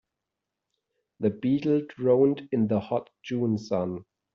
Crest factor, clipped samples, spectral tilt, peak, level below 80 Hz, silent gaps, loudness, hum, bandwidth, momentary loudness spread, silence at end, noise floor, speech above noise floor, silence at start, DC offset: 16 dB; under 0.1%; -8 dB/octave; -10 dBFS; -66 dBFS; none; -27 LUFS; none; 7 kHz; 10 LU; 0.3 s; -86 dBFS; 60 dB; 1.2 s; under 0.1%